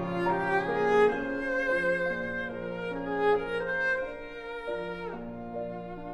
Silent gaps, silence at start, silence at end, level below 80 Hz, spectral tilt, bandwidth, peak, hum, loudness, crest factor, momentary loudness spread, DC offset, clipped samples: none; 0 s; 0 s; -52 dBFS; -6.5 dB/octave; 10.5 kHz; -12 dBFS; none; -30 LUFS; 18 dB; 12 LU; under 0.1%; under 0.1%